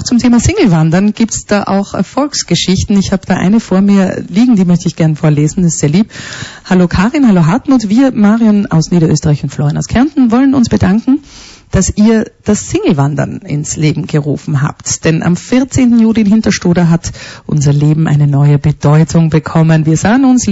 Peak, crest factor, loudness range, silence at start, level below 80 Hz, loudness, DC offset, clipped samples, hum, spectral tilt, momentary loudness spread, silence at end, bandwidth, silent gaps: -2 dBFS; 8 dB; 3 LU; 0 s; -32 dBFS; -10 LUFS; under 0.1%; under 0.1%; none; -6 dB/octave; 6 LU; 0 s; 8 kHz; none